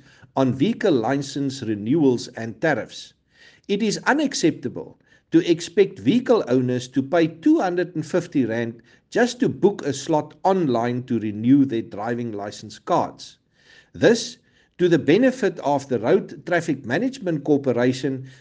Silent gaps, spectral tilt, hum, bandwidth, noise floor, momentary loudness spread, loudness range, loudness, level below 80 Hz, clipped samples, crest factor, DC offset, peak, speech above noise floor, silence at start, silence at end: none; -6 dB/octave; none; 9.6 kHz; -54 dBFS; 10 LU; 3 LU; -22 LUFS; -64 dBFS; under 0.1%; 18 dB; under 0.1%; -4 dBFS; 33 dB; 0.35 s; 0.1 s